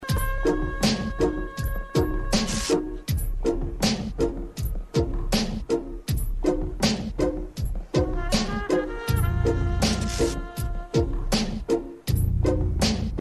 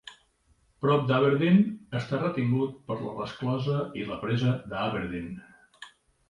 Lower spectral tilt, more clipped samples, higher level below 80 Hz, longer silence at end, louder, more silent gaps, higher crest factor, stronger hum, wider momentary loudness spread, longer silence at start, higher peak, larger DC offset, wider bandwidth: second, -5 dB/octave vs -8.5 dB/octave; neither; first, -30 dBFS vs -58 dBFS; second, 0 s vs 0.4 s; about the same, -26 LUFS vs -28 LUFS; neither; about the same, 16 dB vs 18 dB; neither; second, 6 LU vs 21 LU; about the same, 0 s vs 0.05 s; about the same, -8 dBFS vs -10 dBFS; first, 0.1% vs under 0.1%; first, 13 kHz vs 10.5 kHz